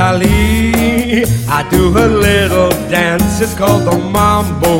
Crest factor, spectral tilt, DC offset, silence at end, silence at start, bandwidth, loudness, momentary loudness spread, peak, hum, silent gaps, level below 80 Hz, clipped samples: 10 dB; -5.5 dB/octave; under 0.1%; 0 s; 0 s; 17 kHz; -11 LUFS; 3 LU; 0 dBFS; none; none; -22 dBFS; under 0.1%